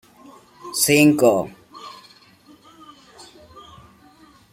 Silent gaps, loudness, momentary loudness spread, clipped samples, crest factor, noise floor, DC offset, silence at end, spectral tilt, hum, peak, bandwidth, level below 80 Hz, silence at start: none; -17 LUFS; 26 LU; under 0.1%; 20 dB; -51 dBFS; under 0.1%; 2.65 s; -4 dB/octave; none; -2 dBFS; 16.5 kHz; -60 dBFS; 0.65 s